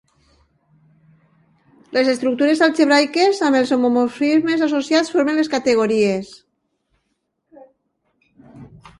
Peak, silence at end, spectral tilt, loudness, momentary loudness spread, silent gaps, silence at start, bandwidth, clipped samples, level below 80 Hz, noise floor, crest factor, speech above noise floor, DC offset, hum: -2 dBFS; 0.35 s; -4.5 dB/octave; -17 LUFS; 5 LU; none; 1.9 s; 11.5 kHz; under 0.1%; -62 dBFS; -72 dBFS; 18 dB; 55 dB; under 0.1%; none